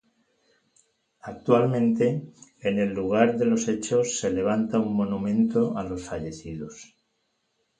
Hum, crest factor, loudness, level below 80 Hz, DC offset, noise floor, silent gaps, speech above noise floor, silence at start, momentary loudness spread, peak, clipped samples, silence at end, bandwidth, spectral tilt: none; 20 dB; -25 LUFS; -56 dBFS; under 0.1%; -74 dBFS; none; 50 dB; 1.25 s; 14 LU; -6 dBFS; under 0.1%; 0.95 s; 9.4 kHz; -6 dB/octave